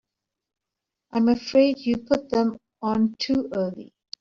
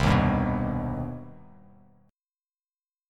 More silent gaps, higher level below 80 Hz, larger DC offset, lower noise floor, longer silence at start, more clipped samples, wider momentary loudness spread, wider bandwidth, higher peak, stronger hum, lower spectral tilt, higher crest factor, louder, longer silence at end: neither; second, -58 dBFS vs -40 dBFS; neither; second, -86 dBFS vs under -90 dBFS; first, 1.15 s vs 0 s; neither; second, 11 LU vs 18 LU; second, 7.4 kHz vs 12 kHz; first, -6 dBFS vs -10 dBFS; neither; second, -5 dB/octave vs -7.5 dB/octave; about the same, 18 dB vs 20 dB; first, -24 LUFS vs -27 LUFS; second, 0.35 s vs 1.7 s